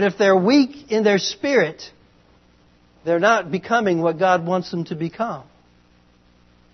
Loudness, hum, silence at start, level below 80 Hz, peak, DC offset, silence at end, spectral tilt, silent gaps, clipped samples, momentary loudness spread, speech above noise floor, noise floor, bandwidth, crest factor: -19 LUFS; 60 Hz at -50 dBFS; 0 s; -62 dBFS; -2 dBFS; under 0.1%; 1.3 s; -5 dB/octave; none; under 0.1%; 11 LU; 36 dB; -55 dBFS; 6.4 kHz; 18 dB